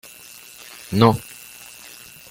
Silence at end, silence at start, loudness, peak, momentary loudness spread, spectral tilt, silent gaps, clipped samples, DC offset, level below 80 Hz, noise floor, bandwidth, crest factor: 1.1 s; 0.9 s; -19 LUFS; -2 dBFS; 23 LU; -6 dB/octave; none; under 0.1%; under 0.1%; -54 dBFS; -43 dBFS; 17 kHz; 22 dB